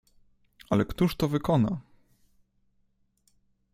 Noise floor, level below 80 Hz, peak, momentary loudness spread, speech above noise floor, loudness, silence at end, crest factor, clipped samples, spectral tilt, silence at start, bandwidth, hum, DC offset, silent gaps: -70 dBFS; -52 dBFS; -10 dBFS; 5 LU; 44 dB; -27 LUFS; 1.95 s; 20 dB; under 0.1%; -7.5 dB/octave; 0.7 s; 16 kHz; none; under 0.1%; none